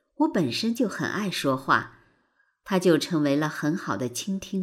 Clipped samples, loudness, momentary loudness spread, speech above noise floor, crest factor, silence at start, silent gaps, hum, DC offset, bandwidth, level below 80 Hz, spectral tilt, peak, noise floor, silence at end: under 0.1%; -25 LUFS; 7 LU; 44 dB; 20 dB; 0.2 s; none; none; under 0.1%; 16 kHz; -66 dBFS; -5 dB/octave; -6 dBFS; -69 dBFS; 0 s